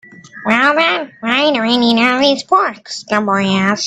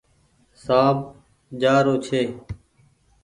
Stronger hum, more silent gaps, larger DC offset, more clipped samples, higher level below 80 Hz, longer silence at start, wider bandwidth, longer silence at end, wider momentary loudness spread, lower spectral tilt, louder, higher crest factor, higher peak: neither; neither; neither; neither; about the same, -56 dBFS vs -52 dBFS; second, 0.35 s vs 0.65 s; second, 9.4 kHz vs 11.5 kHz; second, 0 s vs 0.7 s; second, 8 LU vs 21 LU; second, -4 dB/octave vs -6.5 dB/octave; first, -13 LUFS vs -21 LUFS; second, 14 dB vs 20 dB; first, 0 dBFS vs -4 dBFS